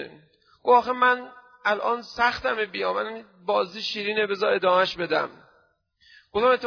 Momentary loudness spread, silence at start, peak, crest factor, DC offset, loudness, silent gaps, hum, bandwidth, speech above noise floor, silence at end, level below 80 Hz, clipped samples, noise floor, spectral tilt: 11 LU; 0 s; -6 dBFS; 18 dB; under 0.1%; -24 LUFS; none; none; 5.4 kHz; 41 dB; 0 s; -62 dBFS; under 0.1%; -64 dBFS; -4 dB/octave